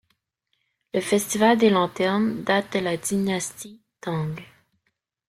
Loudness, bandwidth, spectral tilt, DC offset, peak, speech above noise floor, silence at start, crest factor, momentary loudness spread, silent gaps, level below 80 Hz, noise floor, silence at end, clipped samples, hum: -23 LUFS; 15.5 kHz; -4.5 dB/octave; under 0.1%; -6 dBFS; 53 dB; 0.95 s; 20 dB; 15 LU; none; -64 dBFS; -75 dBFS; 0.85 s; under 0.1%; none